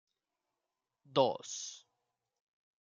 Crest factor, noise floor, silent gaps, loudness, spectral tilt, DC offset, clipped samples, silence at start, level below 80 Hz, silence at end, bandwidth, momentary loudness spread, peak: 26 dB; -89 dBFS; none; -35 LUFS; -3.5 dB/octave; under 0.1%; under 0.1%; 1.1 s; under -90 dBFS; 1.05 s; 9.4 kHz; 15 LU; -14 dBFS